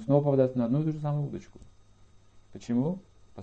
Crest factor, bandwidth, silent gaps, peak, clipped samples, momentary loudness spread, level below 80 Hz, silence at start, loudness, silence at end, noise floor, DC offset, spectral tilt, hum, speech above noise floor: 18 dB; 7.8 kHz; none; -12 dBFS; under 0.1%; 16 LU; -60 dBFS; 0 s; -28 LUFS; 0 s; -58 dBFS; under 0.1%; -10 dB/octave; none; 30 dB